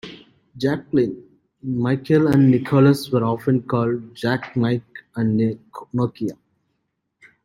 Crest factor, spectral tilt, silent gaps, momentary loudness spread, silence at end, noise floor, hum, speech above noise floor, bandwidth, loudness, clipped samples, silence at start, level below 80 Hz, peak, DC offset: 18 dB; -8 dB/octave; none; 14 LU; 1.1 s; -74 dBFS; none; 55 dB; 16 kHz; -20 LUFS; under 0.1%; 0.05 s; -56 dBFS; -4 dBFS; under 0.1%